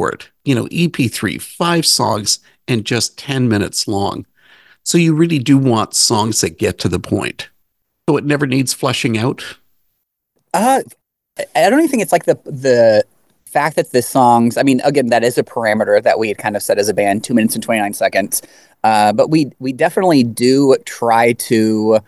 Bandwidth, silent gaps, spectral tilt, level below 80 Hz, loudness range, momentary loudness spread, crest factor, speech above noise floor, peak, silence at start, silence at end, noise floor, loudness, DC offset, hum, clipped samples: 13 kHz; none; -4.5 dB/octave; -48 dBFS; 4 LU; 9 LU; 14 dB; 54 dB; 0 dBFS; 0 s; 0.05 s; -68 dBFS; -15 LUFS; 0.1%; none; under 0.1%